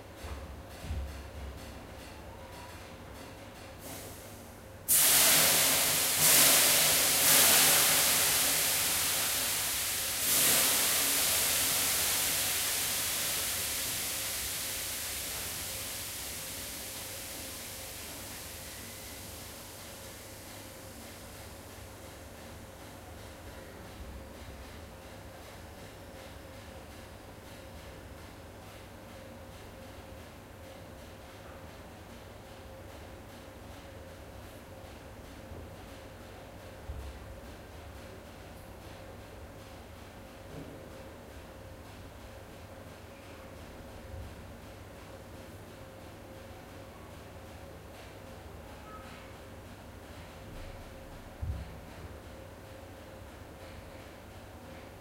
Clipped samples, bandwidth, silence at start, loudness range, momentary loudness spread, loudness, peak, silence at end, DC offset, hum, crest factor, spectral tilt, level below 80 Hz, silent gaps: under 0.1%; 16 kHz; 0 s; 25 LU; 25 LU; -26 LUFS; -6 dBFS; 0 s; under 0.1%; none; 28 dB; -0.5 dB/octave; -52 dBFS; none